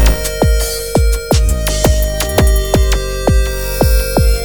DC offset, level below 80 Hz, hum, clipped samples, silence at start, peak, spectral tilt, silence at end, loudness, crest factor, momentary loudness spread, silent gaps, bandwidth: under 0.1%; -14 dBFS; none; under 0.1%; 0 s; 0 dBFS; -4.5 dB/octave; 0 s; -14 LUFS; 12 dB; 3 LU; none; over 20 kHz